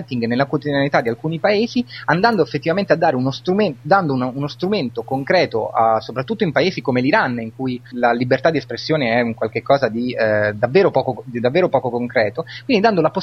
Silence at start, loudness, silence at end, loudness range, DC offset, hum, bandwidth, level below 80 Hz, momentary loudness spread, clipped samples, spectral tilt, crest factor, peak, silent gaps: 0 s; -18 LUFS; 0 s; 1 LU; under 0.1%; none; 6.6 kHz; -56 dBFS; 7 LU; under 0.1%; -7 dB/octave; 16 dB; 0 dBFS; none